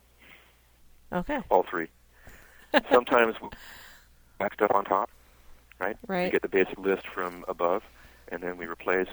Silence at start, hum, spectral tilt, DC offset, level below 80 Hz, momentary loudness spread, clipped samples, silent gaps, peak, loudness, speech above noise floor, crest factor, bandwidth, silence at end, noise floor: 0.3 s; none; -6 dB/octave; under 0.1%; -56 dBFS; 15 LU; under 0.1%; none; -4 dBFS; -28 LUFS; 31 dB; 24 dB; over 20 kHz; 0 s; -58 dBFS